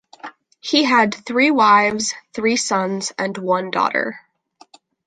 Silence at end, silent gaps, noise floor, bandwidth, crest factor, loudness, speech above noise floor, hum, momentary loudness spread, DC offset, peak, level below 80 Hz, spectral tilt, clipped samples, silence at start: 0.9 s; none; -53 dBFS; 9.6 kHz; 18 dB; -18 LUFS; 35 dB; none; 14 LU; under 0.1%; -2 dBFS; -64 dBFS; -3 dB/octave; under 0.1%; 0.25 s